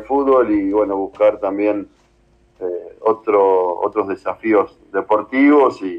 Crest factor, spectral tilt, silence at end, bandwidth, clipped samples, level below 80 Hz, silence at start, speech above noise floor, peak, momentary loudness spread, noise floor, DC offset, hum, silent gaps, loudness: 14 dB; -7.5 dB/octave; 0 s; 7.4 kHz; under 0.1%; -54 dBFS; 0 s; 39 dB; -4 dBFS; 11 LU; -55 dBFS; under 0.1%; none; none; -17 LUFS